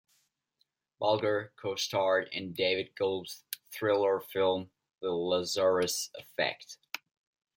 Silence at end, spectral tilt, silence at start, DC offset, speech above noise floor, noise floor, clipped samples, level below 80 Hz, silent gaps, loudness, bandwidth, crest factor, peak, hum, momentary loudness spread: 0.6 s; -3.5 dB/octave; 1 s; under 0.1%; 47 dB; -78 dBFS; under 0.1%; -78 dBFS; none; -31 LUFS; 16.5 kHz; 22 dB; -10 dBFS; none; 13 LU